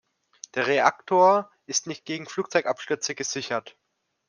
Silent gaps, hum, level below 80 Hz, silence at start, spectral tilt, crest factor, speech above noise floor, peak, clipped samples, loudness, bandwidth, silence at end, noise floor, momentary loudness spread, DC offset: none; none; -78 dBFS; 0.55 s; -2.5 dB/octave; 22 dB; 24 dB; -4 dBFS; under 0.1%; -25 LUFS; 10.5 kHz; 0.6 s; -49 dBFS; 13 LU; under 0.1%